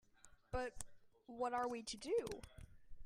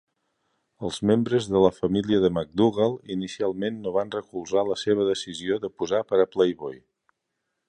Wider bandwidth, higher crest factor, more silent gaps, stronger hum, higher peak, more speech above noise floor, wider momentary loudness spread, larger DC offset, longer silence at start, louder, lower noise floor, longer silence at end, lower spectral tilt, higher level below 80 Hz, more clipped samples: first, 15 kHz vs 10.5 kHz; about the same, 20 dB vs 20 dB; neither; neither; second, -26 dBFS vs -6 dBFS; second, 23 dB vs 56 dB; first, 18 LU vs 10 LU; neither; second, 0.25 s vs 0.8 s; second, -44 LUFS vs -25 LUFS; second, -67 dBFS vs -80 dBFS; second, 0 s vs 0.9 s; second, -4 dB/octave vs -6 dB/octave; about the same, -60 dBFS vs -56 dBFS; neither